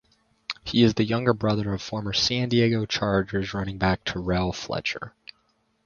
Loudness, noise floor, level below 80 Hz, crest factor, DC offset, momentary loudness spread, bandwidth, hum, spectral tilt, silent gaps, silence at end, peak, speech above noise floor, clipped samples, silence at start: -25 LUFS; -69 dBFS; -46 dBFS; 20 dB; under 0.1%; 10 LU; 7.2 kHz; none; -5.5 dB/octave; none; 0.75 s; -4 dBFS; 44 dB; under 0.1%; 0.5 s